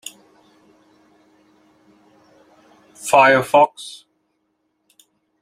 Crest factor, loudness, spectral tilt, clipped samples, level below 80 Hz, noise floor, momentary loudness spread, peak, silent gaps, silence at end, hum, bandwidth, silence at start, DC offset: 22 dB; -15 LUFS; -3.5 dB/octave; under 0.1%; -68 dBFS; -70 dBFS; 24 LU; 0 dBFS; none; 1.5 s; none; 15.5 kHz; 3.05 s; under 0.1%